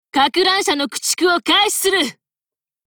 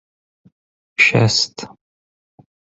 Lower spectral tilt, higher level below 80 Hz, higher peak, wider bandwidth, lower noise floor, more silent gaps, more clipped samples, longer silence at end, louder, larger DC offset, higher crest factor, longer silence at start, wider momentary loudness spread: second, -0.5 dB/octave vs -3.5 dB/octave; second, -58 dBFS vs -52 dBFS; about the same, -4 dBFS vs -2 dBFS; first, over 20 kHz vs 8 kHz; about the same, under -90 dBFS vs under -90 dBFS; neither; neither; second, 0.75 s vs 1.05 s; about the same, -16 LUFS vs -15 LUFS; neither; about the same, 16 dB vs 20 dB; second, 0.15 s vs 1 s; second, 5 LU vs 22 LU